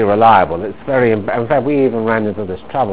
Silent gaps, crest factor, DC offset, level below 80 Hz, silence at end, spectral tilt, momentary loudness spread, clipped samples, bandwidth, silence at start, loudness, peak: none; 14 dB; 2%; -42 dBFS; 0 s; -10.5 dB/octave; 12 LU; 0.2%; 4 kHz; 0 s; -15 LUFS; 0 dBFS